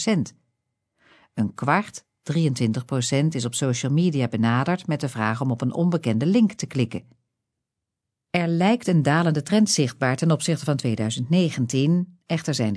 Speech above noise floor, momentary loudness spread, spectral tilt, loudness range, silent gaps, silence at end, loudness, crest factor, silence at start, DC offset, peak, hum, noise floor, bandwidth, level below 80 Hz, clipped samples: 62 dB; 8 LU; -5.5 dB/octave; 3 LU; none; 0 s; -23 LUFS; 18 dB; 0 s; under 0.1%; -4 dBFS; none; -84 dBFS; 11 kHz; -66 dBFS; under 0.1%